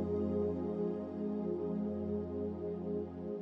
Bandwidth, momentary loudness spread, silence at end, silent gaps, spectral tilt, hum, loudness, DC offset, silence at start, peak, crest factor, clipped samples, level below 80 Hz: 5.6 kHz; 5 LU; 0 s; none; -11 dB/octave; none; -38 LUFS; under 0.1%; 0 s; -24 dBFS; 14 dB; under 0.1%; -60 dBFS